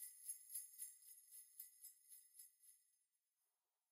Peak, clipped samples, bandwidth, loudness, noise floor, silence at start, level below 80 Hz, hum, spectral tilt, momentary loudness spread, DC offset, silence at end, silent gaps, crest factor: -36 dBFS; under 0.1%; 16 kHz; -56 LUFS; under -90 dBFS; 0 s; under -90 dBFS; none; 5.5 dB/octave; 13 LU; under 0.1%; 1 s; none; 24 dB